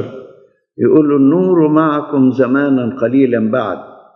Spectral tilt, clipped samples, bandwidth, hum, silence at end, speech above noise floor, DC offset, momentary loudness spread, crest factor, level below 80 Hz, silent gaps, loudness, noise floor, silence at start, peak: -10 dB/octave; under 0.1%; 4.1 kHz; none; 0.3 s; 33 dB; under 0.1%; 7 LU; 12 dB; -66 dBFS; none; -13 LUFS; -45 dBFS; 0 s; 0 dBFS